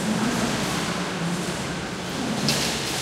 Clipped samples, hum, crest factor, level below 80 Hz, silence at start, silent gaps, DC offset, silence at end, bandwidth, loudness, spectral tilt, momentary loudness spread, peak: under 0.1%; none; 20 dB; -48 dBFS; 0 s; none; under 0.1%; 0 s; 16 kHz; -25 LUFS; -3.5 dB/octave; 6 LU; -6 dBFS